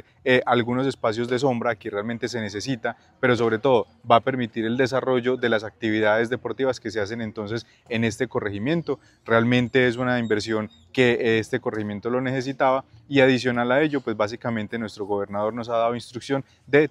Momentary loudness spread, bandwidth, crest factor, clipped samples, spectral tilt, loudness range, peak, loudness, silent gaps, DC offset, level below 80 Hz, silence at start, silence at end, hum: 9 LU; 11.5 kHz; 20 dB; under 0.1%; -6 dB/octave; 3 LU; -2 dBFS; -23 LUFS; none; under 0.1%; -60 dBFS; 0.25 s; 0 s; none